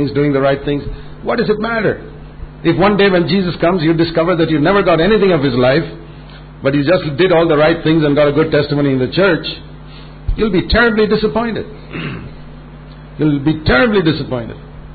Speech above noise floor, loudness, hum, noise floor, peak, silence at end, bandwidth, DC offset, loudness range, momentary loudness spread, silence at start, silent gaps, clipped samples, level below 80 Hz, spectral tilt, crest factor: 20 dB; -14 LUFS; none; -33 dBFS; -2 dBFS; 0 s; 4.8 kHz; under 0.1%; 4 LU; 18 LU; 0 s; none; under 0.1%; -32 dBFS; -12 dB/octave; 14 dB